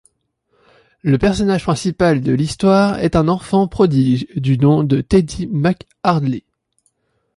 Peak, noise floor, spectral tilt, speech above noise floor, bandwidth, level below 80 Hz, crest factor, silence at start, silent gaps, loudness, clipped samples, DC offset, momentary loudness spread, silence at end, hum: -2 dBFS; -65 dBFS; -7 dB/octave; 50 dB; 11.5 kHz; -38 dBFS; 14 dB; 1.05 s; none; -16 LUFS; under 0.1%; under 0.1%; 6 LU; 1 s; none